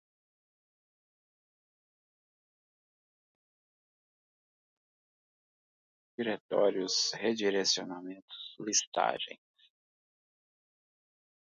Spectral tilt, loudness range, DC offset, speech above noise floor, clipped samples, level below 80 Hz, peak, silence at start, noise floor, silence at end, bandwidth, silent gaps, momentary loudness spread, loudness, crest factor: -1.5 dB/octave; 6 LU; under 0.1%; over 57 dB; under 0.1%; -88 dBFS; -14 dBFS; 6.2 s; under -90 dBFS; 2.15 s; 7.4 kHz; 6.40-6.49 s, 8.22-8.28 s, 8.87-8.92 s; 16 LU; -31 LUFS; 24 dB